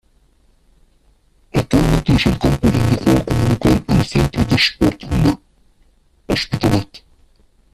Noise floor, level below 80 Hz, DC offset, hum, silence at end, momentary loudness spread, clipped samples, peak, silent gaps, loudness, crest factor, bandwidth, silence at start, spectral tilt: -55 dBFS; -30 dBFS; under 0.1%; none; 0.75 s; 6 LU; under 0.1%; 0 dBFS; none; -16 LUFS; 16 dB; 14.5 kHz; 1.55 s; -6 dB/octave